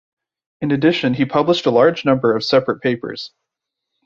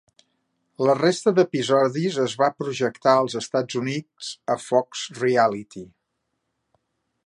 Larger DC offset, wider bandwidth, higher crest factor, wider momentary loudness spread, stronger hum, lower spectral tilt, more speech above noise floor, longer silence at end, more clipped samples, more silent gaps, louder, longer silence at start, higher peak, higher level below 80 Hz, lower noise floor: neither; second, 7.4 kHz vs 11.5 kHz; second, 16 dB vs 22 dB; about the same, 12 LU vs 12 LU; neither; first, -6.5 dB/octave vs -5 dB/octave; first, 64 dB vs 55 dB; second, 0.8 s vs 1.4 s; neither; neither; first, -17 LUFS vs -22 LUFS; second, 0.6 s vs 0.8 s; about the same, -2 dBFS vs -2 dBFS; first, -58 dBFS vs -70 dBFS; about the same, -80 dBFS vs -77 dBFS